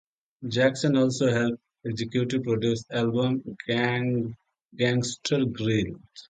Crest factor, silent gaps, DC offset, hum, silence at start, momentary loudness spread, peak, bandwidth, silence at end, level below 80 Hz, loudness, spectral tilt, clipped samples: 18 dB; 4.62-4.69 s; under 0.1%; none; 0.4 s; 9 LU; -8 dBFS; 9.4 kHz; 0.1 s; -58 dBFS; -26 LUFS; -5.5 dB/octave; under 0.1%